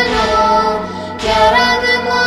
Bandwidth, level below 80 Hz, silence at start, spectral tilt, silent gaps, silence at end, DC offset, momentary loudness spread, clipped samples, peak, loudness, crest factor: 15 kHz; -34 dBFS; 0 s; -3.5 dB/octave; none; 0 s; under 0.1%; 10 LU; under 0.1%; 0 dBFS; -12 LUFS; 14 dB